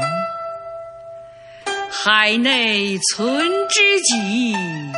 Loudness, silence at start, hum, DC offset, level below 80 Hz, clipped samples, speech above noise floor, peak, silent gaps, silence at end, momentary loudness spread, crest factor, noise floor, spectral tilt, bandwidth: -16 LUFS; 0 s; none; under 0.1%; -64 dBFS; under 0.1%; 22 dB; -2 dBFS; none; 0 s; 19 LU; 18 dB; -39 dBFS; -2 dB/octave; 11 kHz